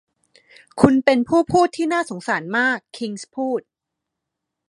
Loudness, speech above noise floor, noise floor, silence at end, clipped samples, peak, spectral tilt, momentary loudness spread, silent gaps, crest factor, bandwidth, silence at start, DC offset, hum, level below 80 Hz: -20 LUFS; 63 dB; -82 dBFS; 1.1 s; under 0.1%; 0 dBFS; -5.5 dB/octave; 13 LU; none; 20 dB; 11.5 kHz; 0.75 s; under 0.1%; none; -52 dBFS